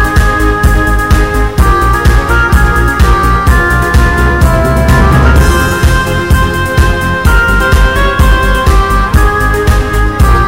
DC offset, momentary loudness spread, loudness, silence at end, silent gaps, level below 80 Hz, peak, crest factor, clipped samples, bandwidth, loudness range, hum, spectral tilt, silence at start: 2%; 3 LU; -9 LUFS; 0 s; none; -10 dBFS; 0 dBFS; 8 dB; 1%; 16.5 kHz; 1 LU; none; -5.5 dB/octave; 0 s